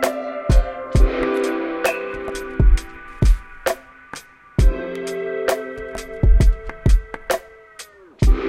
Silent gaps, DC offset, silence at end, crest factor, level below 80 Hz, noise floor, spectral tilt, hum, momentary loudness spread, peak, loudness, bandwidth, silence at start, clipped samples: none; under 0.1%; 0 s; 16 dB; -20 dBFS; -42 dBFS; -6 dB/octave; none; 18 LU; -2 dBFS; -22 LUFS; 15.5 kHz; 0 s; under 0.1%